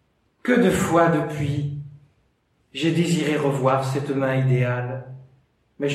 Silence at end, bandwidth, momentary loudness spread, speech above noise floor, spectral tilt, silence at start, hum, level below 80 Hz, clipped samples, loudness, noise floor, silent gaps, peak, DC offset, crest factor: 0 s; 14 kHz; 15 LU; 45 dB; -6.5 dB/octave; 0.45 s; none; -54 dBFS; under 0.1%; -22 LUFS; -66 dBFS; none; -6 dBFS; under 0.1%; 18 dB